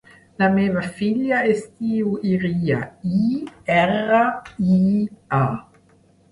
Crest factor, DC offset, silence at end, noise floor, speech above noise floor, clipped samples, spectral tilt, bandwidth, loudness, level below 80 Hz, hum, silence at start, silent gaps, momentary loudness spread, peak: 16 dB; under 0.1%; 0.7 s; -55 dBFS; 35 dB; under 0.1%; -8 dB/octave; 11 kHz; -20 LUFS; -54 dBFS; none; 0.4 s; none; 6 LU; -6 dBFS